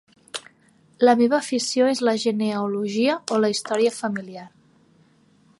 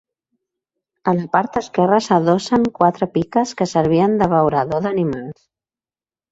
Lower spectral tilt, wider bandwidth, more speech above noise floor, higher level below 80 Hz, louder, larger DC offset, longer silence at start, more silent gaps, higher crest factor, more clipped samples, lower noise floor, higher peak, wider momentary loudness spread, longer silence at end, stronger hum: second, -4 dB/octave vs -6.5 dB/octave; first, 11.5 kHz vs 8 kHz; second, 37 dB vs over 73 dB; second, -76 dBFS vs -52 dBFS; second, -21 LUFS vs -17 LUFS; neither; second, 0.35 s vs 1.05 s; neither; about the same, 20 dB vs 18 dB; neither; second, -58 dBFS vs under -90 dBFS; second, -4 dBFS vs 0 dBFS; first, 17 LU vs 6 LU; about the same, 1.1 s vs 1 s; neither